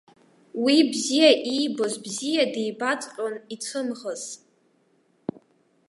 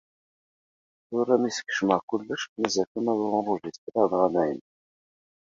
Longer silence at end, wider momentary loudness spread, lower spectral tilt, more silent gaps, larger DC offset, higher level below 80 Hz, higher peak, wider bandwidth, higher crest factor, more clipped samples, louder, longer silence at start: first, 1.55 s vs 0.95 s; first, 19 LU vs 8 LU; second, -2.5 dB/octave vs -4.5 dB/octave; second, none vs 2.03-2.08 s, 2.49-2.56 s, 2.87-2.95 s, 3.78-3.87 s; neither; second, -78 dBFS vs -68 dBFS; about the same, -6 dBFS vs -6 dBFS; first, 11.5 kHz vs 7.8 kHz; about the same, 20 dB vs 22 dB; neither; about the same, -24 LUFS vs -26 LUFS; second, 0.55 s vs 1.1 s